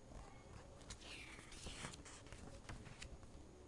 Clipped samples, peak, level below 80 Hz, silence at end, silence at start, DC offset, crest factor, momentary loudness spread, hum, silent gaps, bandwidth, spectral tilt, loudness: under 0.1%; -30 dBFS; -62 dBFS; 0 s; 0 s; under 0.1%; 26 dB; 8 LU; none; none; 11.5 kHz; -3.5 dB/octave; -56 LUFS